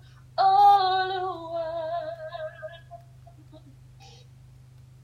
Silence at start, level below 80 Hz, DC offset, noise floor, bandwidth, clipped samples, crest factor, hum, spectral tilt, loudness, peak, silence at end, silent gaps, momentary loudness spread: 0.35 s; -62 dBFS; under 0.1%; -50 dBFS; 13 kHz; under 0.1%; 18 dB; none; -5 dB/octave; -24 LUFS; -10 dBFS; 0.95 s; none; 22 LU